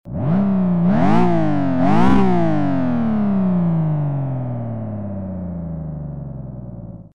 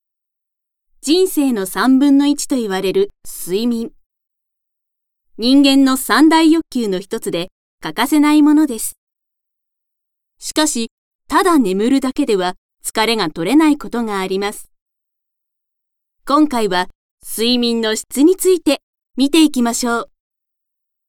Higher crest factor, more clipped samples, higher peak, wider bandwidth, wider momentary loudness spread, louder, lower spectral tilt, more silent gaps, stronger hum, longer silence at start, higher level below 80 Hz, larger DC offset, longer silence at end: about the same, 14 dB vs 16 dB; neither; second, -4 dBFS vs 0 dBFS; second, 6.8 kHz vs 17.5 kHz; about the same, 15 LU vs 13 LU; second, -19 LUFS vs -15 LUFS; first, -9.5 dB/octave vs -3.5 dB/octave; second, none vs 4.06-4.10 s, 7.52-7.78 s, 8.98-9.07 s, 10.91-11.19 s, 12.58-12.69 s, 14.82-14.86 s, 16.95-17.18 s, 18.83-18.93 s; neither; second, 0.05 s vs 1.05 s; first, -40 dBFS vs -48 dBFS; neither; second, 0 s vs 1.05 s